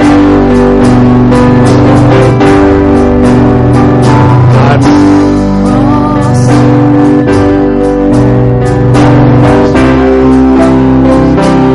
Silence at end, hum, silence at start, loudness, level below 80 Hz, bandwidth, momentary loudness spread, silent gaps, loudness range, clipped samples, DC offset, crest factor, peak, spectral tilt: 0 s; none; 0 s; -5 LUFS; -18 dBFS; 11.5 kHz; 3 LU; none; 2 LU; 0.5%; under 0.1%; 4 dB; 0 dBFS; -8 dB/octave